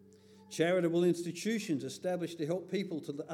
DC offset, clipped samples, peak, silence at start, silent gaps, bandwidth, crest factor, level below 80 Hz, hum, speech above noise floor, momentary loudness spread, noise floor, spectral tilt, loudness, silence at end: under 0.1%; under 0.1%; -16 dBFS; 0.35 s; none; 14.5 kHz; 18 dB; -90 dBFS; none; 25 dB; 8 LU; -59 dBFS; -5.5 dB/octave; -34 LUFS; 0 s